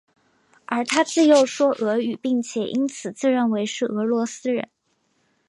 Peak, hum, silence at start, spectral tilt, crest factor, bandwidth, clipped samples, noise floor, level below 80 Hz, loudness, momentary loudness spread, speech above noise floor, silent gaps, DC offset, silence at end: -4 dBFS; none; 0.7 s; -4 dB/octave; 18 dB; 11.5 kHz; under 0.1%; -68 dBFS; -74 dBFS; -22 LUFS; 10 LU; 47 dB; none; under 0.1%; 0.85 s